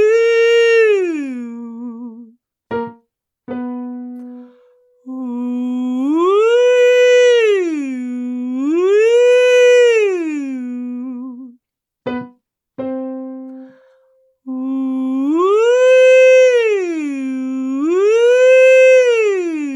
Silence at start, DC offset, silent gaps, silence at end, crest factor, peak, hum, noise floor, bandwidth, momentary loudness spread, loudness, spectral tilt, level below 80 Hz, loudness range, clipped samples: 0 s; under 0.1%; none; 0 s; 12 dB; -2 dBFS; none; -68 dBFS; 11 kHz; 20 LU; -13 LUFS; -3 dB/octave; -70 dBFS; 16 LU; under 0.1%